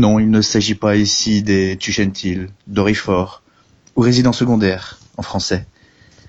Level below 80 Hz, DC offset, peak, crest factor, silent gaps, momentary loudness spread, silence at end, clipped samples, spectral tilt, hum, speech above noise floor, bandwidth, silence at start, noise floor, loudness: -42 dBFS; under 0.1%; -2 dBFS; 14 dB; none; 11 LU; 0.65 s; under 0.1%; -5 dB/octave; none; 37 dB; 8 kHz; 0 s; -52 dBFS; -16 LUFS